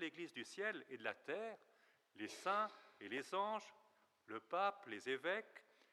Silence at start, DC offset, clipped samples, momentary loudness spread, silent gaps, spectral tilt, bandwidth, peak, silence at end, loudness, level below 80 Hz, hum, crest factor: 0 s; under 0.1%; under 0.1%; 13 LU; none; -3.5 dB/octave; 14 kHz; -26 dBFS; 0.3 s; -45 LUFS; under -90 dBFS; none; 20 dB